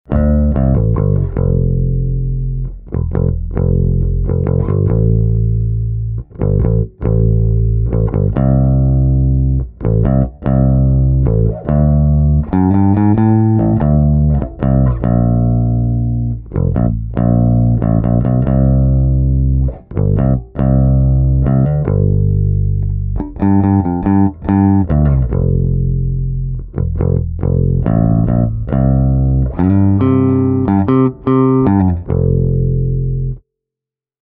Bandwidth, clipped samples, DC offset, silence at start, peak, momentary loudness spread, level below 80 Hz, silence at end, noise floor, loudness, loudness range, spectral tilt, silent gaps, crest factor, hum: 3.1 kHz; under 0.1%; under 0.1%; 0.1 s; 0 dBFS; 6 LU; -20 dBFS; 0.85 s; -86 dBFS; -14 LUFS; 3 LU; -14.5 dB/octave; none; 12 dB; none